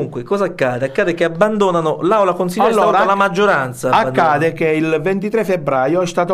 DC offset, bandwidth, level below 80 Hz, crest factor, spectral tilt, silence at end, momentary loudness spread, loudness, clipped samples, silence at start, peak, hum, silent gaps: under 0.1%; 15.5 kHz; -52 dBFS; 14 dB; -6 dB/octave; 0 s; 5 LU; -15 LUFS; under 0.1%; 0 s; 0 dBFS; none; none